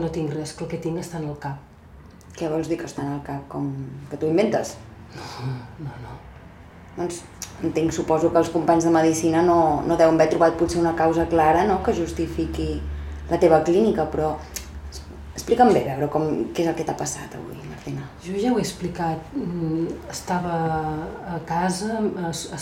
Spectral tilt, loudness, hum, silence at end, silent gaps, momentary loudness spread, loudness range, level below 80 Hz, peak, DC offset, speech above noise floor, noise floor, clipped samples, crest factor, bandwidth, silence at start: -6 dB/octave; -23 LUFS; none; 0 s; none; 18 LU; 11 LU; -42 dBFS; -4 dBFS; under 0.1%; 23 dB; -45 dBFS; under 0.1%; 20 dB; 16 kHz; 0 s